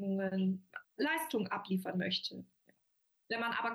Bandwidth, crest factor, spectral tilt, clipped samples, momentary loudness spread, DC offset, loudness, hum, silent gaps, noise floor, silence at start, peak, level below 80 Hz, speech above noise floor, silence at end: over 20 kHz; 14 dB; -5.5 dB/octave; under 0.1%; 9 LU; under 0.1%; -37 LUFS; none; none; -75 dBFS; 0 s; -24 dBFS; -86 dBFS; 39 dB; 0 s